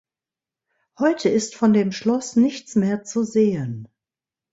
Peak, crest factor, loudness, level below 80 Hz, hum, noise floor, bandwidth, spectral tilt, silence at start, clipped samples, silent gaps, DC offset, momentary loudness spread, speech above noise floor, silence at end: -6 dBFS; 16 dB; -21 LUFS; -62 dBFS; none; -90 dBFS; 8 kHz; -6 dB/octave; 1 s; under 0.1%; none; under 0.1%; 6 LU; 70 dB; 0.7 s